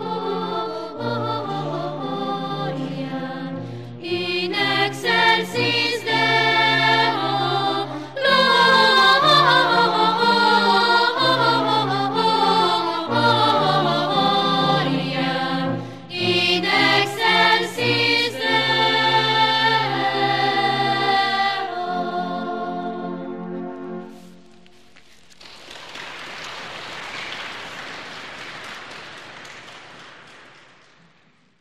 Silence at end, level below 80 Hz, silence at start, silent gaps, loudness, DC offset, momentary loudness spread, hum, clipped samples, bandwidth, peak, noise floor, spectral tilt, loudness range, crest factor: 1.15 s; -64 dBFS; 0 s; none; -18 LUFS; 0.4%; 18 LU; none; under 0.1%; 15.5 kHz; -4 dBFS; -58 dBFS; -4.5 dB/octave; 19 LU; 18 dB